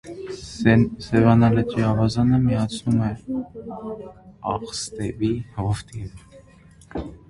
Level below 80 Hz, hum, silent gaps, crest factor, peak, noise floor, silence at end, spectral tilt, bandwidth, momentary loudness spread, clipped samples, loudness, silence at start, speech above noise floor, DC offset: -44 dBFS; none; none; 20 dB; -2 dBFS; -50 dBFS; 0.15 s; -7 dB/octave; 11.5 kHz; 18 LU; under 0.1%; -21 LUFS; 0.05 s; 28 dB; under 0.1%